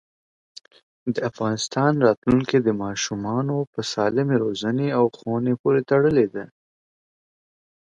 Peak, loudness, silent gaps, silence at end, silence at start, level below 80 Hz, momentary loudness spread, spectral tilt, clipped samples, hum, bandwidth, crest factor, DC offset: -4 dBFS; -22 LUFS; 2.17-2.22 s, 3.67-3.73 s, 5.59-5.64 s; 1.45 s; 1.05 s; -56 dBFS; 8 LU; -6 dB/octave; under 0.1%; none; 9.2 kHz; 20 dB; under 0.1%